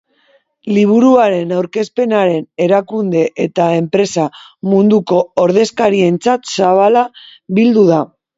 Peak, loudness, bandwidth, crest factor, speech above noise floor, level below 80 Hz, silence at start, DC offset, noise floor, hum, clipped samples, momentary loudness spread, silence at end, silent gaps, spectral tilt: 0 dBFS; -13 LUFS; 8 kHz; 12 dB; 43 dB; -58 dBFS; 0.65 s; under 0.1%; -55 dBFS; none; under 0.1%; 8 LU; 0.3 s; none; -6.5 dB/octave